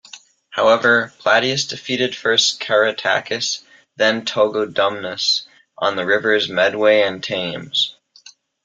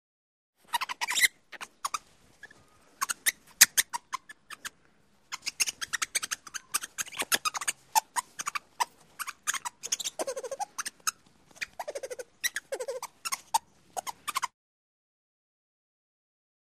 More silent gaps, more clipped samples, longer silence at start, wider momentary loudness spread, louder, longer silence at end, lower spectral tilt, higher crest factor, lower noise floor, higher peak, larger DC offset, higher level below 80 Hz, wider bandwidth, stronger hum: neither; neither; second, 0.15 s vs 0.7 s; second, 8 LU vs 14 LU; first, -18 LUFS vs -31 LUFS; second, 0.75 s vs 2.15 s; first, -2.5 dB/octave vs 2 dB/octave; second, 18 dB vs 34 dB; second, -47 dBFS vs -66 dBFS; about the same, 0 dBFS vs 0 dBFS; neither; first, -64 dBFS vs -74 dBFS; second, 9.2 kHz vs 15.5 kHz; neither